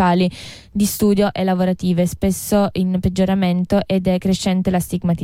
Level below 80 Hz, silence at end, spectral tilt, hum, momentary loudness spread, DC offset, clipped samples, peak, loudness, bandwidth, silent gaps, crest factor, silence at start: -38 dBFS; 0 s; -6 dB/octave; none; 5 LU; under 0.1%; under 0.1%; -6 dBFS; -18 LUFS; 16.5 kHz; none; 12 dB; 0 s